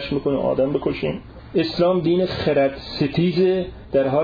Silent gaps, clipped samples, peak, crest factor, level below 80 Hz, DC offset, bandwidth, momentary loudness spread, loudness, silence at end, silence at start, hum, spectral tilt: none; under 0.1%; -8 dBFS; 12 dB; -44 dBFS; under 0.1%; 5 kHz; 7 LU; -21 LUFS; 0 s; 0 s; none; -8.5 dB/octave